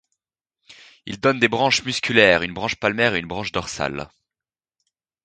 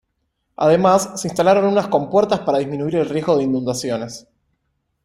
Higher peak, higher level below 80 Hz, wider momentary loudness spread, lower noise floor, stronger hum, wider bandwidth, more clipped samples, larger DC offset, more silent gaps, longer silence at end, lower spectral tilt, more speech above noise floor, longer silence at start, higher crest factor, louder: about the same, 0 dBFS vs -2 dBFS; about the same, -52 dBFS vs -56 dBFS; first, 16 LU vs 9 LU; first, under -90 dBFS vs -71 dBFS; neither; second, 9.4 kHz vs 16 kHz; neither; neither; neither; first, 1.2 s vs 0.85 s; second, -3.5 dB/octave vs -5.5 dB/octave; first, over 69 dB vs 54 dB; about the same, 0.7 s vs 0.6 s; first, 22 dB vs 16 dB; about the same, -20 LUFS vs -18 LUFS